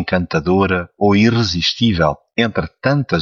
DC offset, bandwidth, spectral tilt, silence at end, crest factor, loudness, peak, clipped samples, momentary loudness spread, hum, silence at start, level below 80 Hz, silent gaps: under 0.1%; 7.2 kHz; -6 dB/octave; 0 s; 14 dB; -16 LUFS; -2 dBFS; under 0.1%; 5 LU; none; 0 s; -40 dBFS; none